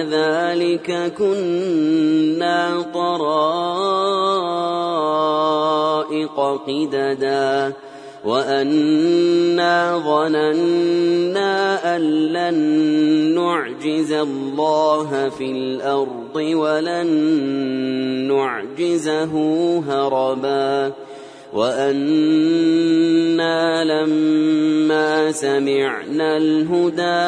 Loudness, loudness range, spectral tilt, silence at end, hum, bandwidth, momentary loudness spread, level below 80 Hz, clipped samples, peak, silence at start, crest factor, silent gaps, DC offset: -18 LUFS; 3 LU; -5.5 dB/octave; 0 s; none; 10.5 kHz; 6 LU; -68 dBFS; under 0.1%; -4 dBFS; 0 s; 14 dB; none; under 0.1%